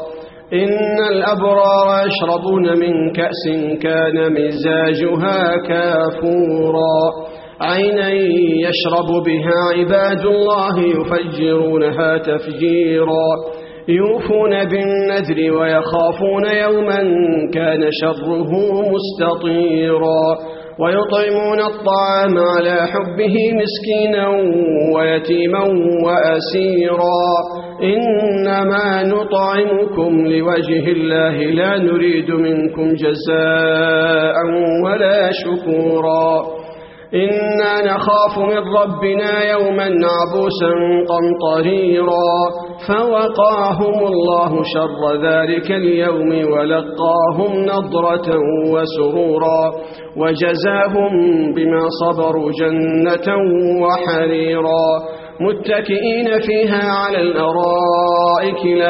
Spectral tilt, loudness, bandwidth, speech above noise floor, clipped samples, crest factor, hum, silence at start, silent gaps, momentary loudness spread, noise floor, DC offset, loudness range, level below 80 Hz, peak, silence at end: -4 dB/octave; -15 LUFS; 5.8 kHz; 20 dB; under 0.1%; 14 dB; none; 0 s; none; 4 LU; -34 dBFS; under 0.1%; 1 LU; -52 dBFS; -2 dBFS; 0 s